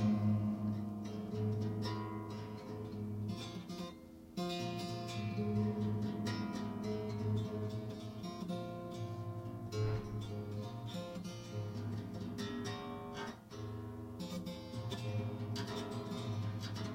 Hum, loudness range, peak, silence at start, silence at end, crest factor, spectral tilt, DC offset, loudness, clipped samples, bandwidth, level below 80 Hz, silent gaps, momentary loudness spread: none; 5 LU; -24 dBFS; 0 s; 0 s; 16 dB; -7 dB/octave; under 0.1%; -41 LUFS; under 0.1%; 16 kHz; -62 dBFS; none; 8 LU